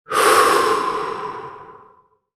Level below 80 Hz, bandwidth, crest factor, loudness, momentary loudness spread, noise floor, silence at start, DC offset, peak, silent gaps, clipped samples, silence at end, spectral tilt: -58 dBFS; 16.5 kHz; 20 dB; -17 LUFS; 19 LU; -54 dBFS; 0.1 s; under 0.1%; 0 dBFS; none; under 0.1%; 0.65 s; -1.5 dB/octave